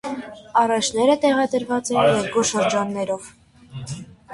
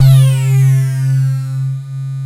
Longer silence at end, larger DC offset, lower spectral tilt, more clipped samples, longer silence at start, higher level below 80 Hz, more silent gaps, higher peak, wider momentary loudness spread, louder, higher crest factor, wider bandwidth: about the same, 0 s vs 0 s; neither; second, -4 dB/octave vs -7 dB/octave; neither; about the same, 0.05 s vs 0 s; second, -56 dBFS vs -44 dBFS; neither; second, -4 dBFS vs 0 dBFS; first, 16 LU vs 11 LU; second, -20 LUFS vs -13 LUFS; about the same, 16 dB vs 12 dB; second, 11.5 kHz vs 14.5 kHz